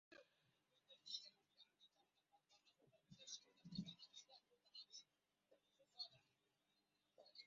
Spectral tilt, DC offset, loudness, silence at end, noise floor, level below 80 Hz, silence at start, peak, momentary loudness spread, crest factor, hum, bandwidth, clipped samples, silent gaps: -3.5 dB/octave; under 0.1%; -58 LUFS; 0 s; -88 dBFS; under -90 dBFS; 0.1 s; -38 dBFS; 12 LU; 26 dB; none; 7.4 kHz; under 0.1%; none